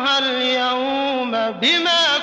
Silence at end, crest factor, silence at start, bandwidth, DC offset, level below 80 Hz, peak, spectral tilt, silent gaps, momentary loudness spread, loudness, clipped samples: 0 s; 12 dB; 0 s; 8 kHz; under 0.1%; -62 dBFS; -8 dBFS; -2 dB/octave; none; 6 LU; -17 LUFS; under 0.1%